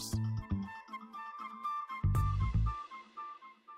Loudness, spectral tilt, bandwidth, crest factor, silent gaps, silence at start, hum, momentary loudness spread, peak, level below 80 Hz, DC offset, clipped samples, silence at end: -38 LUFS; -6 dB/octave; 16 kHz; 16 dB; none; 0 s; none; 14 LU; -20 dBFS; -42 dBFS; under 0.1%; under 0.1%; 0 s